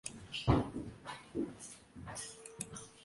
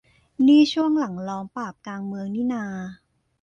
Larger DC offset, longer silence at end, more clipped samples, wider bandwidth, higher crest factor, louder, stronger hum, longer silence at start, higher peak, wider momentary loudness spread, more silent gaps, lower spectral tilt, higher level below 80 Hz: neither; second, 0 s vs 0.5 s; neither; first, 11.5 kHz vs 7.2 kHz; first, 24 dB vs 16 dB; second, -40 LUFS vs -22 LUFS; neither; second, 0.05 s vs 0.4 s; second, -16 dBFS vs -6 dBFS; about the same, 17 LU vs 17 LU; neither; about the same, -5 dB/octave vs -6 dB/octave; first, -52 dBFS vs -64 dBFS